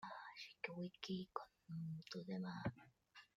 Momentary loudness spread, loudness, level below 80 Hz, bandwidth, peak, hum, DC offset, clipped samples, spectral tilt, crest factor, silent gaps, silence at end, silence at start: 9 LU; -50 LUFS; -78 dBFS; 7.6 kHz; -28 dBFS; none; under 0.1%; under 0.1%; -6.5 dB/octave; 24 dB; none; 0.1 s; 0 s